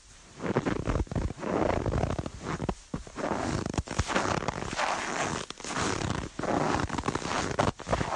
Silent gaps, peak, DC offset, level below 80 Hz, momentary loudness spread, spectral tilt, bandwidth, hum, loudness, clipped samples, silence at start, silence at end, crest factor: none; -10 dBFS; under 0.1%; -42 dBFS; 7 LU; -5 dB/octave; 11.5 kHz; none; -31 LUFS; under 0.1%; 0.05 s; 0 s; 20 dB